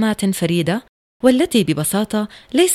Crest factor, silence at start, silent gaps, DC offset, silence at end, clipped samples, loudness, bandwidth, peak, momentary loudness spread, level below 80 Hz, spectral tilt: 16 dB; 0 s; 0.89-1.20 s; under 0.1%; 0 s; under 0.1%; -18 LUFS; 16.5 kHz; 0 dBFS; 7 LU; -52 dBFS; -4.5 dB/octave